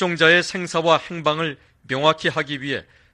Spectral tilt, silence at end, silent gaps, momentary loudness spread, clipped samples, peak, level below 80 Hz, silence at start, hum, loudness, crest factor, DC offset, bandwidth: -4 dB/octave; 0.3 s; none; 13 LU; under 0.1%; 0 dBFS; -60 dBFS; 0 s; none; -20 LUFS; 20 dB; under 0.1%; 11 kHz